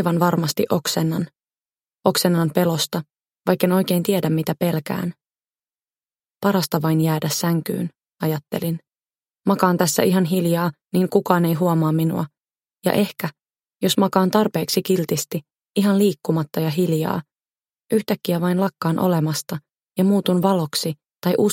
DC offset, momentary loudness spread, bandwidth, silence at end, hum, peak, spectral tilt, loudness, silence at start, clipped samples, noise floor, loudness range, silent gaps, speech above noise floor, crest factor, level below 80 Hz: under 0.1%; 9 LU; 17 kHz; 0 s; none; 0 dBFS; -5.5 dB/octave; -21 LUFS; 0 s; under 0.1%; under -90 dBFS; 3 LU; none; over 70 dB; 20 dB; -64 dBFS